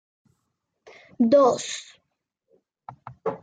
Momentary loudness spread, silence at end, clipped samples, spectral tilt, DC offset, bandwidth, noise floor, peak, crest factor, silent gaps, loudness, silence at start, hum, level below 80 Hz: 24 LU; 0.05 s; under 0.1%; -4.5 dB/octave; under 0.1%; 9.4 kHz; -78 dBFS; -8 dBFS; 18 dB; none; -22 LUFS; 1.2 s; none; -72 dBFS